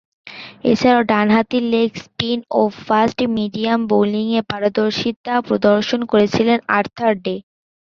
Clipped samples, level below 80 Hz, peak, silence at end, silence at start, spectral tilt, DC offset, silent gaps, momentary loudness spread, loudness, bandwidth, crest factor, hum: under 0.1%; -54 dBFS; 0 dBFS; 0.5 s; 0.25 s; -6 dB/octave; under 0.1%; 5.16-5.24 s; 8 LU; -17 LUFS; 7.2 kHz; 16 dB; none